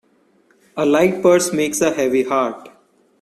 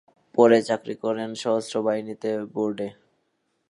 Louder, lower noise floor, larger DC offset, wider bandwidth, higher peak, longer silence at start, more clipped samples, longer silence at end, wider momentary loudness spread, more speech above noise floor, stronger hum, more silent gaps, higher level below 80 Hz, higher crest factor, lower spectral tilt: first, -17 LUFS vs -24 LUFS; second, -57 dBFS vs -73 dBFS; neither; first, 14.5 kHz vs 11.5 kHz; about the same, -2 dBFS vs -4 dBFS; first, 0.75 s vs 0.35 s; neither; second, 0.5 s vs 0.8 s; about the same, 10 LU vs 11 LU; second, 41 dB vs 50 dB; neither; neither; first, -58 dBFS vs -74 dBFS; second, 16 dB vs 22 dB; about the same, -4.5 dB/octave vs -5.5 dB/octave